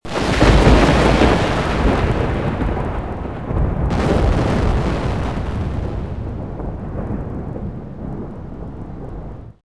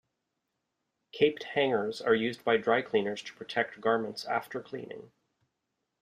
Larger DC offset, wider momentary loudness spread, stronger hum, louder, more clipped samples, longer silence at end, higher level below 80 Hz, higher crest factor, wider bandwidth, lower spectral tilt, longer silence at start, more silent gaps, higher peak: first, 1% vs under 0.1%; first, 18 LU vs 14 LU; neither; first, -18 LUFS vs -30 LUFS; neither; second, 0 s vs 0.95 s; first, -22 dBFS vs -74 dBFS; about the same, 18 dB vs 20 dB; second, 11 kHz vs 14.5 kHz; first, -6.5 dB/octave vs -5 dB/octave; second, 0 s vs 1.15 s; neither; first, 0 dBFS vs -12 dBFS